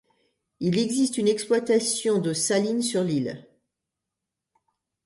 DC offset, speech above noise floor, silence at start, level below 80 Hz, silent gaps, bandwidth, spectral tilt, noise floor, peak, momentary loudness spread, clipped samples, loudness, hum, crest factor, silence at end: under 0.1%; 62 dB; 0.6 s; -70 dBFS; none; 12 kHz; -4.5 dB/octave; -85 dBFS; -10 dBFS; 6 LU; under 0.1%; -24 LUFS; none; 16 dB; 1.65 s